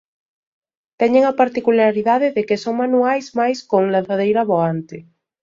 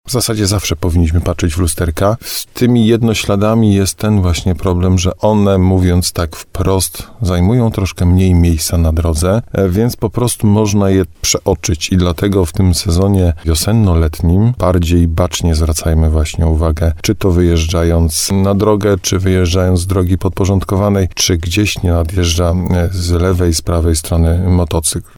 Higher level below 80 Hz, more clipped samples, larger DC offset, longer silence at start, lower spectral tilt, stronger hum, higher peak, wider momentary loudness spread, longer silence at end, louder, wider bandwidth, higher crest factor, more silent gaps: second, -64 dBFS vs -22 dBFS; neither; neither; first, 1 s vs 0.05 s; about the same, -6.5 dB/octave vs -5.5 dB/octave; neither; about the same, -2 dBFS vs 0 dBFS; about the same, 6 LU vs 4 LU; first, 0.4 s vs 0.15 s; second, -17 LUFS vs -13 LUFS; second, 7.6 kHz vs 18 kHz; about the same, 16 dB vs 12 dB; neither